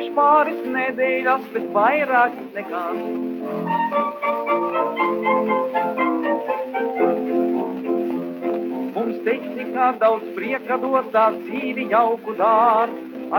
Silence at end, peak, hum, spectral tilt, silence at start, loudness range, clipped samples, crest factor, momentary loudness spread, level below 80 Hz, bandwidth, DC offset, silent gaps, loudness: 0 s; -4 dBFS; none; -7 dB/octave; 0 s; 3 LU; under 0.1%; 16 dB; 9 LU; -74 dBFS; 18 kHz; under 0.1%; none; -21 LUFS